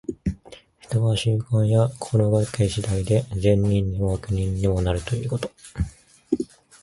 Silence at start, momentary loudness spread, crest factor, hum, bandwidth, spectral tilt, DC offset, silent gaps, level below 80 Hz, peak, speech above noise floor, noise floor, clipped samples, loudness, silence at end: 0.1 s; 11 LU; 18 dB; none; 11.5 kHz; -7 dB/octave; under 0.1%; none; -38 dBFS; -4 dBFS; 26 dB; -47 dBFS; under 0.1%; -23 LUFS; 0.35 s